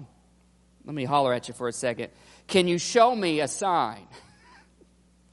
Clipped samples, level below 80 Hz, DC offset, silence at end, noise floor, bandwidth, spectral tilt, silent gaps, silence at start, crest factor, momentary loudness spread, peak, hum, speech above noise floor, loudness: under 0.1%; -64 dBFS; under 0.1%; 1.15 s; -60 dBFS; 11.5 kHz; -4 dB/octave; none; 0 s; 20 dB; 15 LU; -6 dBFS; none; 35 dB; -25 LUFS